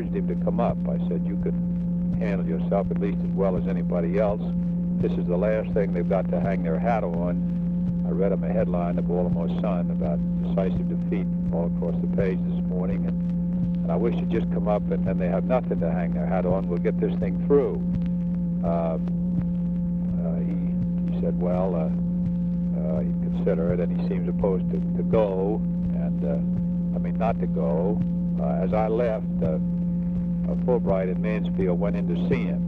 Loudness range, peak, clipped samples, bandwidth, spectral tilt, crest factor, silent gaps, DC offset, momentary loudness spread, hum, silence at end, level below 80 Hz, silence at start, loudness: 1 LU; -10 dBFS; under 0.1%; 3.7 kHz; -11.5 dB/octave; 14 dB; none; under 0.1%; 3 LU; none; 0 s; -38 dBFS; 0 s; -25 LUFS